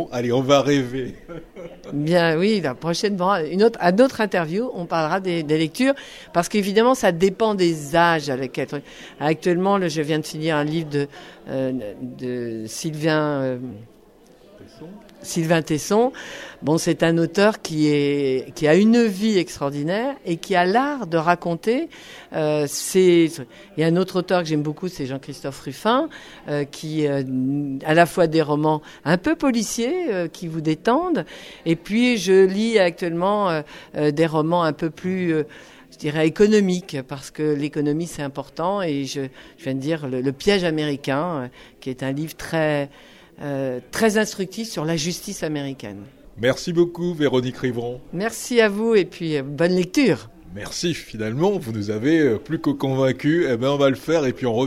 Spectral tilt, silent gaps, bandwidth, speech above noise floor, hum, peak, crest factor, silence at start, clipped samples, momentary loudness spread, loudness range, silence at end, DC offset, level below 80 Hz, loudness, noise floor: -5.5 dB/octave; none; 15.5 kHz; 30 dB; none; -2 dBFS; 20 dB; 0 s; under 0.1%; 13 LU; 5 LU; 0 s; under 0.1%; -54 dBFS; -21 LUFS; -50 dBFS